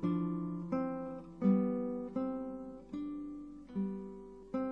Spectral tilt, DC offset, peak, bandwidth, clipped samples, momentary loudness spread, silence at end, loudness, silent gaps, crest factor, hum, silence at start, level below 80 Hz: -10.5 dB/octave; under 0.1%; -20 dBFS; 5.4 kHz; under 0.1%; 14 LU; 0 s; -38 LUFS; none; 18 dB; none; 0 s; -66 dBFS